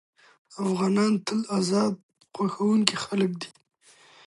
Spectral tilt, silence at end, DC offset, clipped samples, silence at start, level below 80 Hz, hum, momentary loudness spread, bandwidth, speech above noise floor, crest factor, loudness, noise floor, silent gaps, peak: -5 dB/octave; 0.8 s; under 0.1%; under 0.1%; 0.5 s; -72 dBFS; none; 16 LU; 11.5 kHz; 31 dB; 26 dB; -25 LUFS; -56 dBFS; 2.03-2.09 s; 0 dBFS